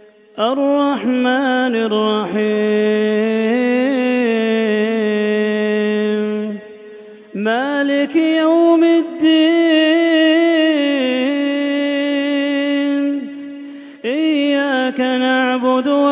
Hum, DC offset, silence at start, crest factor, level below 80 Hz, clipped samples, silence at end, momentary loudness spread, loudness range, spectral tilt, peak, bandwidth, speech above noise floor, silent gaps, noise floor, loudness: none; under 0.1%; 0.35 s; 12 dB; -72 dBFS; under 0.1%; 0 s; 8 LU; 5 LU; -9 dB/octave; -4 dBFS; 4 kHz; 22 dB; none; -37 dBFS; -16 LUFS